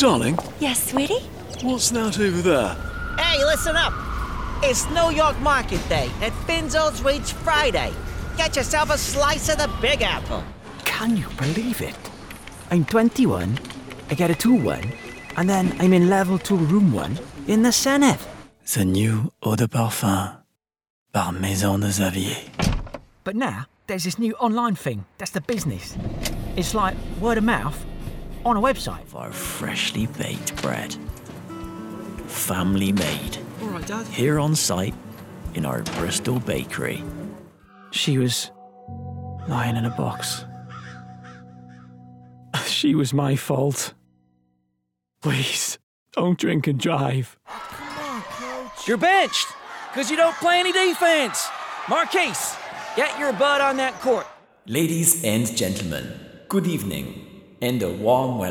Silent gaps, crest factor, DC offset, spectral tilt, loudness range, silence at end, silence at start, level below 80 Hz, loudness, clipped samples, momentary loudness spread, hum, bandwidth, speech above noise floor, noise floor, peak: 20.90-21.06 s, 45.83-46.06 s; 20 dB; under 0.1%; -4.5 dB/octave; 6 LU; 0 s; 0 s; -38 dBFS; -22 LUFS; under 0.1%; 16 LU; none; 19.5 kHz; 54 dB; -76 dBFS; -4 dBFS